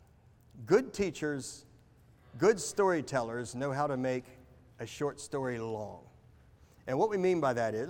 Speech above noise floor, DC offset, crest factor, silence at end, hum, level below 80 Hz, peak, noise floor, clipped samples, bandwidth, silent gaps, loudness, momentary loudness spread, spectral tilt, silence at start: 30 dB; under 0.1%; 20 dB; 0 s; none; -64 dBFS; -14 dBFS; -61 dBFS; under 0.1%; 17.5 kHz; none; -32 LUFS; 16 LU; -5.5 dB/octave; 0.55 s